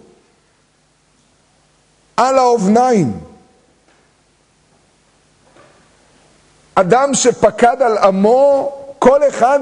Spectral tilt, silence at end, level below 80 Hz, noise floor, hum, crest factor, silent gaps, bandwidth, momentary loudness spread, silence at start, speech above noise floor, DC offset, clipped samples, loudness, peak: -5 dB/octave; 0 s; -52 dBFS; -57 dBFS; none; 16 dB; none; 10.5 kHz; 8 LU; 2.2 s; 45 dB; under 0.1%; under 0.1%; -13 LUFS; 0 dBFS